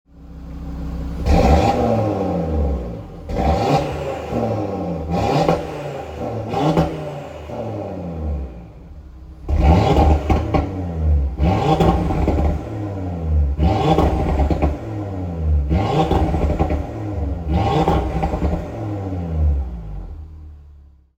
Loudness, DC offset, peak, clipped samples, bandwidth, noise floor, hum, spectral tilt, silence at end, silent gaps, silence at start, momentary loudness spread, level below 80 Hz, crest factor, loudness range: -20 LUFS; under 0.1%; -2 dBFS; under 0.1%; 8.4 kHz; -45 dBFS; none; -8 dB/octave; 0.35 s; none; 0.15 s; 16 LU; -24 dBFS; 18 dB; 5 LU